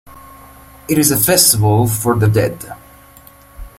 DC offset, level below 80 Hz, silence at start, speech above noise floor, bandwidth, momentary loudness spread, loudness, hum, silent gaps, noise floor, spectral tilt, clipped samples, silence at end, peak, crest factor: under 0.1%; -40 dBFS; 0.1 s; 29 dB; 16.5 kHz; 21 LU; -12 LUFS; none; none; -43 dBFS; -4 dB/octave; under 0.1%; 0.1 s; 0 dBFS; 16 dB